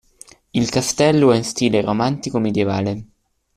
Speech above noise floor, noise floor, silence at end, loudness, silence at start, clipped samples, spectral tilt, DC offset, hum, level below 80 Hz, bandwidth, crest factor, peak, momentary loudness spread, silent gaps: 29 dB; -47 dBFS; 0.5 s; -18 LUFS; 0.55 s; under 0.1%; -5 dB/octave; under 0.1%; none; -52 dBFS; 14.5 kHz; 16 dB; -2 dBFS; 9 LU; none